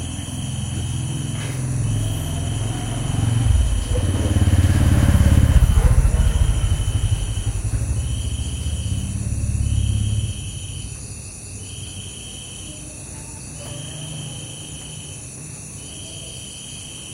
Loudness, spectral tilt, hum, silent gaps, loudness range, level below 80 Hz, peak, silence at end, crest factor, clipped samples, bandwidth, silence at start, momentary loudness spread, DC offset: -22 LUFS; -5 dB/octave; none; none; 14 LU; -24 dBFS; 0 dBFS; 0 s; 20 dB; under 0.1%; 16 kHz; 0 s; 16 LU; under 0.1%